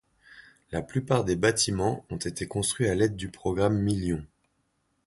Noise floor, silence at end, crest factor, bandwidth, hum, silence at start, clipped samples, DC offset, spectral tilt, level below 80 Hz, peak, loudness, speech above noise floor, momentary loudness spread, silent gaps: -73 dBFS; 0.8 s; 20 dB; 11.5 kHz; none; 0.35 s; under 0.1%; under 0.1%; -5 dB/octave; -48 dBFS; -8 dBFS; -27 LUFS; 46 dB; 10 LU; none